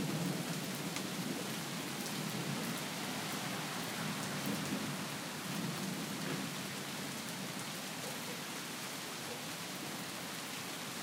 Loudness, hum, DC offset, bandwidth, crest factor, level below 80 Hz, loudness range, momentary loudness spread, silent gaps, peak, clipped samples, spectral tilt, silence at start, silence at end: -40 LUFS; none; under 0.1%; 18 kHz; 20 dB; -80 dBFS; 3 LU; 4 LU; none; -20 dBFS; under 0.1%; -3.5 dB/octave; 0 s; 0 s